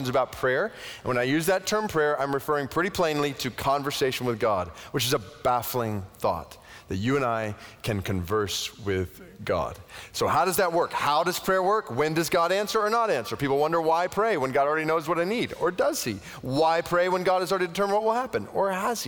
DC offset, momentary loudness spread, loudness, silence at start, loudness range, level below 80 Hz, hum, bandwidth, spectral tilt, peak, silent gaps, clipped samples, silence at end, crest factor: under 0.1%; 7 LU; -26 LUFS; 0 s; 4 LU; -54 dBFS; none; over 20 kHz; -4.5 dB/octave; -12 dBFS; none; under 0.1%; 0 s; 14 dB